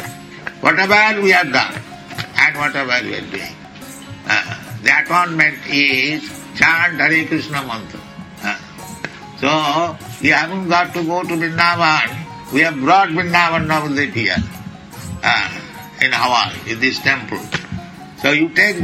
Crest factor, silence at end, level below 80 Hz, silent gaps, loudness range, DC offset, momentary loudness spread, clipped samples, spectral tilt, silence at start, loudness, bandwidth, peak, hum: 18 dB; 0 s; -48 dBFS; none; 4 LU; under 0.1%; 18 LU; under 0.1%; -4 dB/octave; 0 s; -15 LUFS; 16.5 kHz; 0 dBFS; none